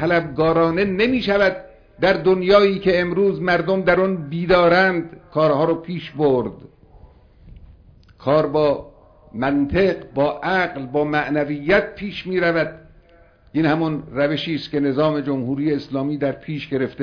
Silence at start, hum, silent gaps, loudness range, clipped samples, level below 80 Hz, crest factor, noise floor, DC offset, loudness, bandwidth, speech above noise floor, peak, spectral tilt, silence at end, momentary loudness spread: 0 s; none; none; 6 LU; under 0.1%; -46 dBFS; 18 dB; -51 dBFS; under 0.1%; -19 LUFS; 5.4 kHz; 32 dB; 0 dBFS; -8 dB/octave; 0 s; 9 LU